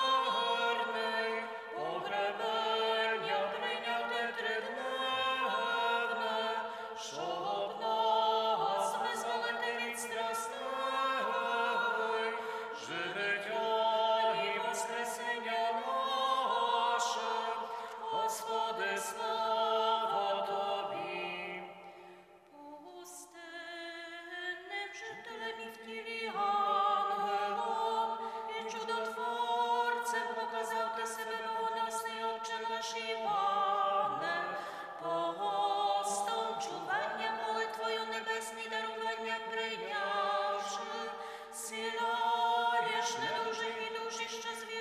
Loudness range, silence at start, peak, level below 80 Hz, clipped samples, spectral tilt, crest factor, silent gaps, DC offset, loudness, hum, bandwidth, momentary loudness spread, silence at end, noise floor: 3 LU; 0 s; -20 dBFS; -84 dBFS; under 0.1%; -1.5 dB/octave; 16 dB; none; under 0.1%; -34 LUFS; none; 15.5 kHz; 10 LU; 0 s; -57 dBFS